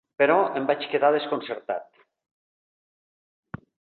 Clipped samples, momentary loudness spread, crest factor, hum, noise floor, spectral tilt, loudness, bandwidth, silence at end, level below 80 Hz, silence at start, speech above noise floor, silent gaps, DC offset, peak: under 0.1%; 22 LU; 20 dB; none; under -90 dBFS; -8.5 dB/octave; -24 LUFS; 4.5 kHz; 2.15 s; -68 dBFS; 0.2 s; over 67 dB; none; under 0.1%; -6 dBFS